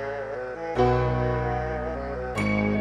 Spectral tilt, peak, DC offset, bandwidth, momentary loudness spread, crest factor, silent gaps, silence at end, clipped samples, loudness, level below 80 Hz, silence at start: -7.5 dB/octave; -10 dBFS; under 0.1%; 10.5 kHz; 9 LU; 16 dB; none; 0 s; under 0.1%; -27 LUFS; -38 dBFS; 0 s